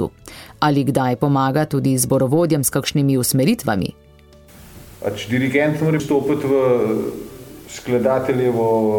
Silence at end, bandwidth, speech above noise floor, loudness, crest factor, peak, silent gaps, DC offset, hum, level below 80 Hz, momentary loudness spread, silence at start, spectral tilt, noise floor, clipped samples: 0 s; 17.5 kHz; 29 dB; -18 LUFS; 14 dB; -4 dBFS; none; under 0.1%; none; -48 dBFS; 12 LU; 0 s; -5.5 dB/octave; -46 dBFS; under 0.1%